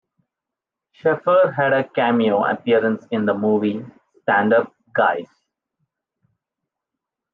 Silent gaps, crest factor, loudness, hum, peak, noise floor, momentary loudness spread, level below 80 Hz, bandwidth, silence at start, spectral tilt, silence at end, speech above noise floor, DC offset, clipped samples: none; 16 dB; -19 LUFS; none; -4 dBFS; -86 dBFS; 8 LU; -72 dBFS; 4.4 kHz; 1.05 s; -8.5 dB/octave; 2.1 s; 67 dB; under 0.1%; under 0.1%